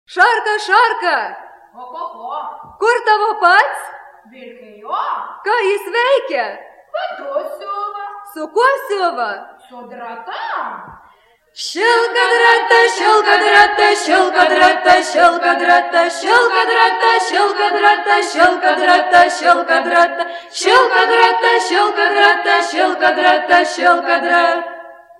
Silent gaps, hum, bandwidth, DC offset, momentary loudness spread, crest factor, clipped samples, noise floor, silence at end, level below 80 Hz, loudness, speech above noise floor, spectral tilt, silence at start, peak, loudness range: none; none; 13.5 kHz; under 0.1%; 16 LU; 14 dB; under 0.1%; -51 dBFS; 0.25 s; -60 dBFS; -13 LUFS; 37 dB; -1 dB/octave; 0.1 s; 0 dBFS; 9 LU